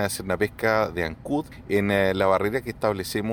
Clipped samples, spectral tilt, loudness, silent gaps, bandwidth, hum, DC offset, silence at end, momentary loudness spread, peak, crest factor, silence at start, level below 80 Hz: under 0.1%; -5 dB/octave; -24 LUFS; none; 19 kHz; none; under 0.1%; 0 s; 8 LU; -8 dBFS; 18 dB; 0 s; -48 dBFS